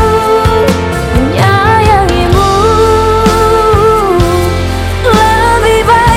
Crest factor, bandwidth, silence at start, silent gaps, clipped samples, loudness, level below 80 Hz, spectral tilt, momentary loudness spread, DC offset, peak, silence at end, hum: 8 dB; 16.5 kHz; 0 s; none; 0.4%; -8 LUFS; -18 dBFS; -5.5 dB/octave; 5 LU; under 0.1%; 0 dBFS; 0 s; none